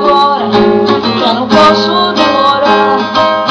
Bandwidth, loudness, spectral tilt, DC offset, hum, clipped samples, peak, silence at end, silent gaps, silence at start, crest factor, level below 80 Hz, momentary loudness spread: 9.6 kHz; -8 LUFS; -5 dB/octave; under 0.1%; none; under 0.1%; 0 dBFS; 0 s; none; 0 s; 8 dB; -42 dBFS; 4 LU